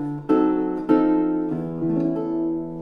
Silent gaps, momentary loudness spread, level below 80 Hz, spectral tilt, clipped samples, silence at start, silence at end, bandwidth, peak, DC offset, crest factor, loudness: none; 7 LU; -54 dBFS; -10 dB/octave; under 0.1%; 0 s; 0 s; 4.2 kHz; -6 dBFS; under 0.1%; 16 dB; -22 LUFS